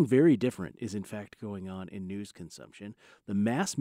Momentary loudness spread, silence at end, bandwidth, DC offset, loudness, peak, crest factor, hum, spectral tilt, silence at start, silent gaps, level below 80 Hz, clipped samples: 22 LU; 0 s; 15.5 kHz; under 0.1%; -31 LUFS; -12 dBFS; 18 dB; none; -6.5 dB/octave; 0 s; none; -68 dBFS; under 0.1%